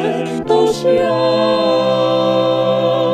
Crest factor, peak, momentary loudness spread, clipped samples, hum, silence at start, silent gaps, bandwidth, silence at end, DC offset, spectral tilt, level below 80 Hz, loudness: 14 dB; 0 dBFS; 1 LU; under 0.1%; none; 0 s; none; 12.5 kHz; 0 s; under 0.1%; -6 dB/octave; -54 dBFS; -14 LUFS